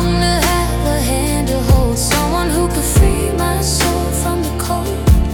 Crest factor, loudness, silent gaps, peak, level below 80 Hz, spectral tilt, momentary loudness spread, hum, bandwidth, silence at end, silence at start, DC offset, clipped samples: 14 dB; -15 LUFS; none; 0 dBFS; -18 dBFS; -4.5 dB/octave; 4 LU; none; 18 kHz; 0 s; 0 s; under 0.1%; under 0.1%